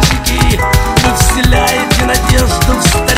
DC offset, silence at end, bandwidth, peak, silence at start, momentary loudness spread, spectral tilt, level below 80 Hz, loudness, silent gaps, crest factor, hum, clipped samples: under 0.1%; 0 s; 16.5 kHz; 0 dBFS; 0 s; 2 LU; -4 dB/octave; -14 dBFS; -10 LUFS; none; 10 dB; none; 0.3%